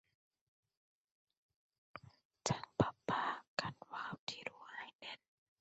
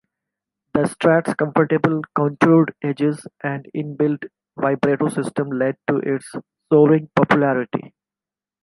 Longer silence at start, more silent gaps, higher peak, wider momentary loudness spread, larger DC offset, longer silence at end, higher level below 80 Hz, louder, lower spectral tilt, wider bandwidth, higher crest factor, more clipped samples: first, 1.95 s vs 0.75 s; first, 2.25-2.30 s, 3.48-3.57 s, 4.19-4.27 s, 4.95-4.99 s vs none; second, -18 dBFS vs 0 dBFS; first, 19 LU vs 13 LU; neither; second, 0.45 s vs 0.75 s; second, -68 dBFS vs -60 dBFS; second, -42 LUFS vs -19 LUFS; second, -3.5 dB/octave vs -7.5 dB/octave; second, 8 kHz vs 11.5 kHz; first, 28 dB vs 18 dB; neither